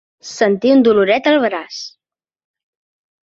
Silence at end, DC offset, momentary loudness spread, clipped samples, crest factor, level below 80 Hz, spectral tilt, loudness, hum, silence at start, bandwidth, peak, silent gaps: 1.35 s; under 0.1%; 18 LU; under 0.1%; 16 dB; -62 dBFS; -5 dB/octave; -14 LUFS; none; 0.25 s; 7.8 kHz; -2 dBFS; none